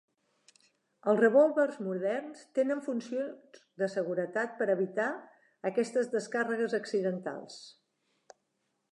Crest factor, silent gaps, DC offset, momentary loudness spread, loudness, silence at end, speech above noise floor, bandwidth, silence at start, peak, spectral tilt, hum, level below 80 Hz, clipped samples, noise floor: 20 dB; none; under 0.1%; 13 LU; -31 LUFS; 1.2 s; 49 dB; 11 kHz; 1.05 s; -14 dBFS; -6 dB/octave; none; -90 dBFS; under 0.1%; -80 dBFS